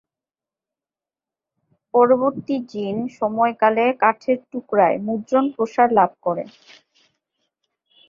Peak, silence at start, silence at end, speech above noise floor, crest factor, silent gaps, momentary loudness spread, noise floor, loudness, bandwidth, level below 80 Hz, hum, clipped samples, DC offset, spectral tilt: -2 dBFS; 1.95 s; 1.65 s; over 71 dB; 20 dB; none; 10 LU; under -90 dBFS; -20 LUFS; 7.2 kHz; -68 dBFS; none; under 0.1%; under 0.1%; -7 dB/octave